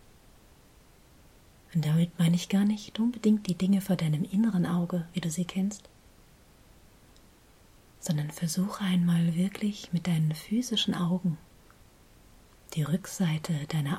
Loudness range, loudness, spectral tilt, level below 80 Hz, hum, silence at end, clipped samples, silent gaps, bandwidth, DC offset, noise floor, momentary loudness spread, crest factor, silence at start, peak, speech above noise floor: 9 LU; -29 LUFS; -6 dB/octave; -60 dBFS; none; 0 s; under 0.1%; none; 15.5 kHz; under 0.1%; -58 dBFS; 7 LU; 16 dB; 1.7 s; -14 dBFS; 30 dB